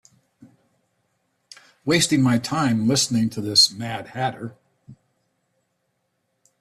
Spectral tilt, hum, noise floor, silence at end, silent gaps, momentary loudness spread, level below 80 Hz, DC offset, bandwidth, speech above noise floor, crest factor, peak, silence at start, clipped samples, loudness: -3.5 dB/octave; none; -73 dBFS; 1.7 s; none; 15 LU; -62 dBFS; under 0.1%; 15.5 kHz; 52 dB; 20 dB; -4 dBFS; 1.85 s; under 0.1%; -20 LUFS